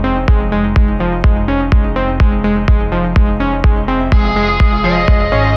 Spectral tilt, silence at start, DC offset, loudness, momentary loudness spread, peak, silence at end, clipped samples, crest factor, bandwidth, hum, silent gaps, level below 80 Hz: -8.5 dB/octave; 0 s; under 0.1%; -14 LUFS; 2 LU; 0 dBFS; 0 s; under 0.1%; 12 dB; 6.2 kHz; none; none; -14 dBFS